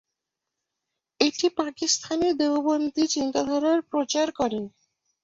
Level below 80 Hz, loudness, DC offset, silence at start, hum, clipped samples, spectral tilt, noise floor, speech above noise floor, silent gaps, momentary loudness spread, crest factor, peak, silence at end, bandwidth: -64 dBFS; -25 LUFS; under 0.1%; 1.2 s; none; under 0.1%; -2.5 dB/octave; -85 dBFS; 60 dB; none; 4 LU; 20 dB; -6 dBFS; 0.55 s; 8 kHz